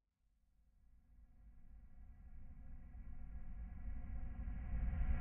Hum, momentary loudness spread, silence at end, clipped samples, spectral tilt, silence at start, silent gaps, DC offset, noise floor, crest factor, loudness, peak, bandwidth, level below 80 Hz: none; 20 LU; 0 s; under 0.1%; -8 dB/octave; 1.1 s; none; under 0.1%; -79 dBFS; 18 dB; -50 LUFS; -28 dBFS; 3 kHz; -48 dBFS